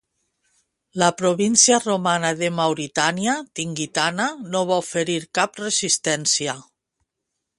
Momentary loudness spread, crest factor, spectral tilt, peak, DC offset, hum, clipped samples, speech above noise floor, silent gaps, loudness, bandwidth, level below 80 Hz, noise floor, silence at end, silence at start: 10 LU; 22 dB; -2.5 dB/octave; 0 dBFS; under 0.1%; none; under 0.1%; 59 dB; none; -20 LUFS; 11.5 kHz; -66 dBFS; -80 dBFS; 1 s; 0.95 s